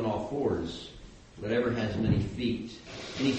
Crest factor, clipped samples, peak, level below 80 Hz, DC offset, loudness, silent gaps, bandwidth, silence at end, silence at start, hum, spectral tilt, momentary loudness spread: 18 dB; under 0.1%; -12 dBFS; -48 dBFS; under 0.1%; -31 LUFS; none; 8.4 kHz; 0 s; 0 s; none; -6.5 dB/octave; 14 LU